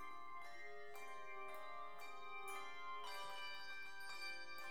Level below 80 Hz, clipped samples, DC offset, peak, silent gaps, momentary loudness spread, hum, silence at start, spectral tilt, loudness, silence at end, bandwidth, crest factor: -88 dBFS; under 0.1%; 0.3%; -38 dBFS; none; 5 LU; none; 0 s; -1.5 dB/octave; -52 LUFS; 0 s; 19 kHz; 14 dB